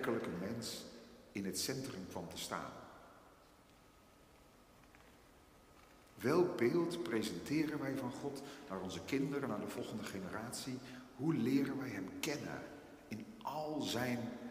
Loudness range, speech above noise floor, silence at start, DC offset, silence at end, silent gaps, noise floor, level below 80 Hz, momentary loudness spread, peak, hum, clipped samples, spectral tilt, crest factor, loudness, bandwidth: 10 LU; 25 dB; 0 s; under 0.1%; 0 s; none; -65 dBFS; -72 dBFS; 15 LU; -20 dBFS; none; under 0.1%; -5 dB/octave; 22 dB; -41 LUFS; 15.5 kHz